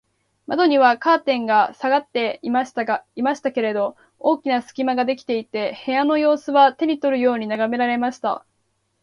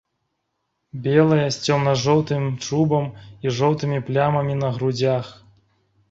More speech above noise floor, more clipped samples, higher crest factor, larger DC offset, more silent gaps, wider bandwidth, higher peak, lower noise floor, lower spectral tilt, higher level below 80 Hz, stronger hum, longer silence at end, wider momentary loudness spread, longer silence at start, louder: second, 50 dB vs 55 dB; neither; about the same, 18 dB vs 18 dB; neither; neither; first, 10.5 kHz vs 8 kHz; about the same, -2 dBFS vs -4 dBFS; second, -69 dBFS vs -75 dBFS; second, -5 dB/octave vs -6.5 dB/octave; second, -68 dBFS vs -56 dBFS; neither; second, 0.65 s vs 0.8 s; about the same, 9 LU vs 9 LU; second, 0.5 s vs 0.95 s; about the same, -20 LUFS vs -21 LUFS